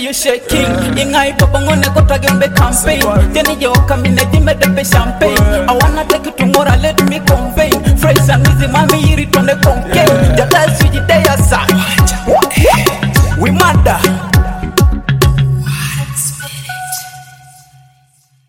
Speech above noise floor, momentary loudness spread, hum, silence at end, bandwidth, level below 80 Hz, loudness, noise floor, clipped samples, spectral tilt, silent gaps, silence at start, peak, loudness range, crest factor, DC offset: 42 dB; 6 LU; none; 1.2 s; 17.5 kHz; -18 dBFS; -10 LUFS; -51 dBFS; under 0.1%; -5 dB/octave; none; 0 s; 0 dBFS; 4 LU; 10 dB; under 0.1%